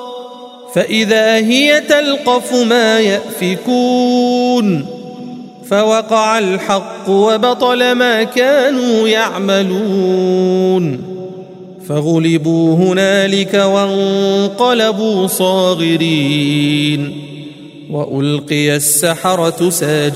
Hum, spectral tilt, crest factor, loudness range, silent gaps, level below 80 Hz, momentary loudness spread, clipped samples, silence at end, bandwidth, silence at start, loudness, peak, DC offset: none; -4.5 dB/octave; 12 dB; 3 LU; none; -60 dBFS; 14 LU; under 0.1%; 0 s; 16 kHz; 0 s; -12 LUFS; 0 dBFS; under 0.1%